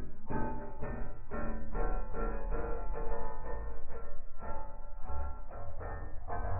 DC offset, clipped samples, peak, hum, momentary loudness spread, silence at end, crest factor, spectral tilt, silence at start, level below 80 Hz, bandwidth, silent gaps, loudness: under 0.1%; under 0.1%; -18 dBFS; none; 8 LU; 0 s; 12 dB; -12 dB/octave; 0 s; -38 dBFS; 2.6 kHz; none; -43 LUFS